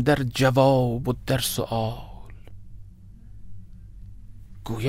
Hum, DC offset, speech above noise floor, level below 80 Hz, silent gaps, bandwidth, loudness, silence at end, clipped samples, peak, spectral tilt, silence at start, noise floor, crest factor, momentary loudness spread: none; under 0.1%; 22 dB; -44 dBFS; none; 16 kHz; -23 LUFS; 0 s; under 0.1%; -6 dBFS; -5.5 dB/octave; 0 s; -44 dBFS; 20 dB; 22 LU